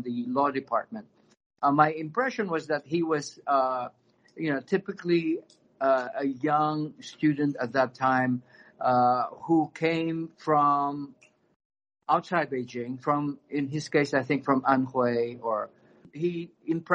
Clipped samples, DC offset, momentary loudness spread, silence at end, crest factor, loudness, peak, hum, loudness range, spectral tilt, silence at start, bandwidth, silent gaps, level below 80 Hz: under 0.1%; under 0.1%; 9 LU; 0 s; 22 dB; -27 LUFS; -6 dBFS; none; 3 LU; -6.5 dB/octave; 0 s; 9.4 kHz; 1.46-1.50 s, 11.56-11.70 s; -72 dBFS